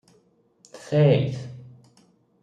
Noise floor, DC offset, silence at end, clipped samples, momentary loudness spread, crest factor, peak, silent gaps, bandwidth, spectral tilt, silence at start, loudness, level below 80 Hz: -62 dBFS; under 0.1%; 0.8 s; under 0.1%; 26 LU; 20 dB; -6 dBFS; none; 9.2 kHz; -8 dB/octave; 0.75 s; -21 LUFS; -66 dBFS